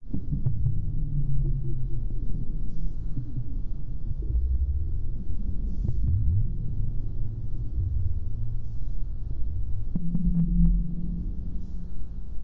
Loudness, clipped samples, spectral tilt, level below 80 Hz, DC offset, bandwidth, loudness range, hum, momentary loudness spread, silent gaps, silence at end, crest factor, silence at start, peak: -31 LUFS; under 0.1%; -12 dB/octave; -28 dBFS; under 0.1%; 1 kHz; 4 LU; none; 11 LU; none; 0 s; 14 dB; 0 s; -8 dBFS